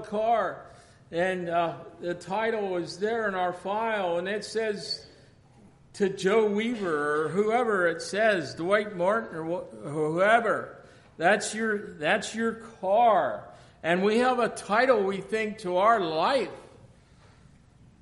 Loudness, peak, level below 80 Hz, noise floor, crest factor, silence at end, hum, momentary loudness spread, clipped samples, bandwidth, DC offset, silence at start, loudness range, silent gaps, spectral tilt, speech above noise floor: -27 LUFS; -10 dBFS; -64 dBFS; -56 dBFS; 18 dB; 1.15 s; none; 11 LU; under 0.1%; 11.5 kHz; under 0.1%; 0 s; 4 LU; none; -4.5 dB/octave; 29 dB